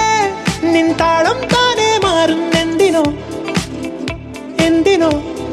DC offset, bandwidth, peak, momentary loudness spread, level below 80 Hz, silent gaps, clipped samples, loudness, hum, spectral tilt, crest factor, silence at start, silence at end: under 0.1%; 13.5 kHz; 0 dBFS; 11 LU; -38 dBFS; none; under 0.1%; -14 LUFS; none; -4.5 dB/octave; 14 dB; 0 s; 0 s